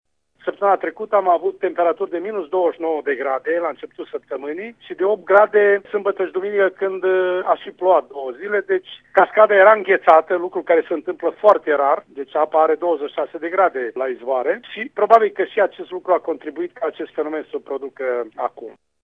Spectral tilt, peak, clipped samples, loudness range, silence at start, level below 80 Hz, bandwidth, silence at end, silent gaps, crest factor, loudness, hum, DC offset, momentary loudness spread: -6.5 dB/octave; 0 dBFS; under 0.1%; 7 LU; 0.45 s; -72 dBFS; 5 kHz; 0.3 s; none; 18 dB; -19 LUFS; none; under 0.1%; 14 LU